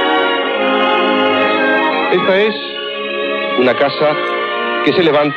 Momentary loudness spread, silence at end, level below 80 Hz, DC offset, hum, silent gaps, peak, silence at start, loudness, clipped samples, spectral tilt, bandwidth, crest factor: 6 LU; 0 s; -60 dBFS; under 0.1%; none; none; 0 dBFS; 0 s; -14 LUFS; under 0.1%; -6.5 dB/octave; 7 kHz; 14 dB